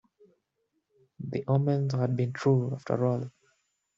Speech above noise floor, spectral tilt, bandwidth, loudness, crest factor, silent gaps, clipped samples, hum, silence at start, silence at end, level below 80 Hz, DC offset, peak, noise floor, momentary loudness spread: 51 dB; -9 dB/octave; 7.4 kHz; -28 LUFS; 18 dB; none; under 0.1%; none; 1.2 s; 0.7 s; -68 dBFS; under 0.1%; -12 dBFS; -78 dBFS; 10 LU